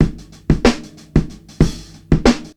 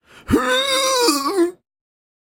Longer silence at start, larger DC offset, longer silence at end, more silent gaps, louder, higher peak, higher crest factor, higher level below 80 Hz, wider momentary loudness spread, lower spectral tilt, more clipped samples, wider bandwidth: second, 0 s vs 0.25 s; neither; second, 0.1 s vs 0.7 s; neither; about the same, -18 LUFS vs -17 LUFS; about the same, 0 dBFS vs 0 dBFS; about the same, 16 dB vs 20 dB; first, -24 dBFS vs -46 dBFS; first, 17 LU vs 5 LU; first, -6.5 dB/octave vs -2.5 dB/octave; neither; second, 12.5 kHz vs 17 kHz